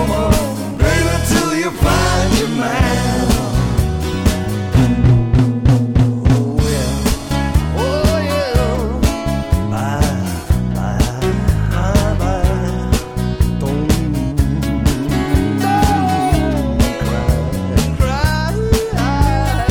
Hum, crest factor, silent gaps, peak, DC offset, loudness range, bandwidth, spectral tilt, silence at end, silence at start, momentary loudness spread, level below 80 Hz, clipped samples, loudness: none; 14 dB; none; -2 dBFS; under 0.1%; 3 LU; 19 kHz; -6 dB/octave; 0 s; 0 s; 4 LU; -20 dBFS; under 0.1%; -16 LUFS